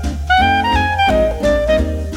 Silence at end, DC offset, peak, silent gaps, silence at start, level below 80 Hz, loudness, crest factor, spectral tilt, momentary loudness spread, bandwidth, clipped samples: 0 s; under 0.1%; -2 dBFS; none; 0 s; -22 dBFS; -14 LUFS; 12 dB; -5.5 dB/octave; 3 LU; 16 kHz; under 0.1%